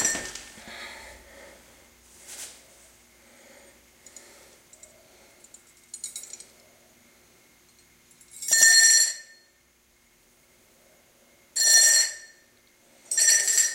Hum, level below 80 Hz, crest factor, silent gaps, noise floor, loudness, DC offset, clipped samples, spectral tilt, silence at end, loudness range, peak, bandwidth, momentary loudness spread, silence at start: none; -66 dBFS; 24 dB; none; -63 dBFS; -18 LUFS; under 0.1%; under 0.1%; 3.5 dB/octave; 0 s; 23 LU; -4 dBFS; 16.5 kHz; 27 LU; 0 s